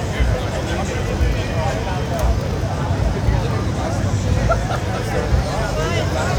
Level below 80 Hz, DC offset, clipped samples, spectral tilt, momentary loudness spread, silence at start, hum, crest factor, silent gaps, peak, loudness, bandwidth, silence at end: -24 dBFS; under 0.1%; under 0.1%; -6 dB/octave; 3 LU; 0 s; none; 16 dB; none; -4 dBFS; -20 LUFS; 16.5 kHz; 0 s